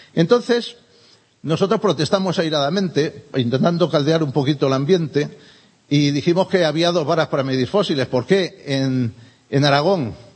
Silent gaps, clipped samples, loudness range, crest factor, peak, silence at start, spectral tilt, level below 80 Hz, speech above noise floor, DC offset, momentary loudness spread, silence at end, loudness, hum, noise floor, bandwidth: none; under 0.1%; 1 LU; 18 dB; -2 dBFS; 0.15 s; -6 dB/octave; -60 dBFS; 35 dB; under 0.1%; 6 LU; 0.15 s; -19 LUFS; none; -53 dBFS; 8.8 kHz